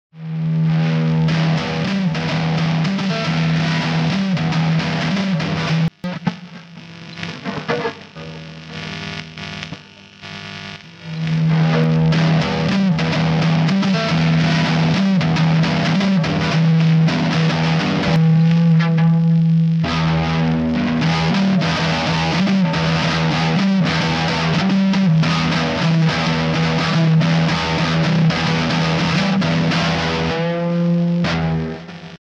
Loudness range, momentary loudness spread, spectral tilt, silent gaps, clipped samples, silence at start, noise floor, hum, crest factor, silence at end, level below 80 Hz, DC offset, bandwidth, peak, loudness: 9 LU; 14 LU; -6.5 dB/octave; none; under 0.1%; 0.15 s; -40 dBFS; none; 14 dB; 0.1 s; -42 dBFS; under 0.1%; 7.6 kHz; -4 dBFS; -17 LUFS